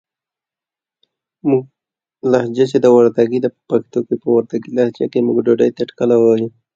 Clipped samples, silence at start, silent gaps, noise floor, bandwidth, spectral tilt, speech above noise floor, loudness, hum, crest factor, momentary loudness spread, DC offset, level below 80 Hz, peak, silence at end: under 0.1%; 1.45 s; none; -89 dBFS; 7.6 kHz; -7.5 dB/octave; 74 dB; -16 LUFS; none; 16 dB; 9 LU; under 0.1%; -62 dBFS; 0 dBFS; 0.25 s